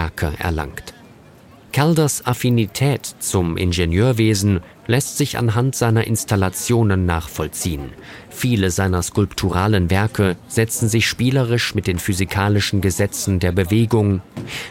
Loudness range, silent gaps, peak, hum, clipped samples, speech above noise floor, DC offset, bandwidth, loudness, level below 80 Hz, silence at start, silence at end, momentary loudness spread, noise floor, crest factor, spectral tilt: 2 LU; none; -2 dBFS; none; under 0.1%; 27 dB; under 0.1%; 17 kHz; -19 LUFS; -38 dBFS; 0 s; 0 s; 8 LU; -45 dBFS; 16 dB; -5 dB/octave